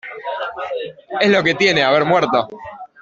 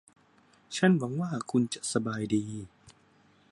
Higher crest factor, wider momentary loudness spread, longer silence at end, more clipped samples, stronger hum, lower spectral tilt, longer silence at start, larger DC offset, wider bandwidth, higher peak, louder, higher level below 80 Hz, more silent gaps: second, 16 dB vs 22 dB; about the same, 14 LU vs 15 LU; second, 0.15 s vs 0.6 s; neither; neither; about the same, -4.5 dB/octave vs -5.5 dB/octave; second, 0.05 s vs 0.7 s; neither; second, 7.8 kHz vs 11.5 kHz; first, -2 dBFS vs -10 dBFS; first, -17 LUFS vs -30 LUFS; first, -58 dBFS vs -68 dBFS; neither